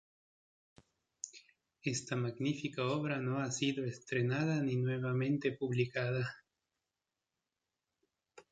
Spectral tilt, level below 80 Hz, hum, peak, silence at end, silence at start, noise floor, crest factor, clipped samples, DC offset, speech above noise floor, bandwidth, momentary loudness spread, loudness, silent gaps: -5.5 dB/octave; -74 dBFS; none; -20 dBFS; 0.1 s; 1.25 s; under -90 dBFS; 18 dB; under 0.1%; under 0.1%; over 55 dB; 9.2 kHz; 9 LU; -36 LUFS; none